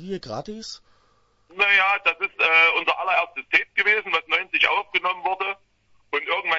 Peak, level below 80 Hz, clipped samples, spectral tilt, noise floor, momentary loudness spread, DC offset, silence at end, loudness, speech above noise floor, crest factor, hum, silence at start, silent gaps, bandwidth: -4 dBFS; -62 dBFS; under 0.1%; -2.5 dB/octave; -62 dBFS; 16 LU; under 0.1%; 0 s; -20 LUFS; 40 dB; 18 dB; none; 0 s; none; 8 kHz